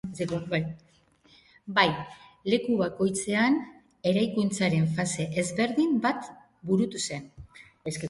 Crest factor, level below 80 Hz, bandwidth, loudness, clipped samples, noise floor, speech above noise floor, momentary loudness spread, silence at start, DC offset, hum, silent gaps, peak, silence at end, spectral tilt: 22 dB; -60 dBFS; 11.5 kHz; -27 LUFS; under 0.1%; -61 dBFS; 34 dB; 16 LU; 0.05 s; under 0.1%; none; none; -6 dBFS; 0 s; -5 dB/octave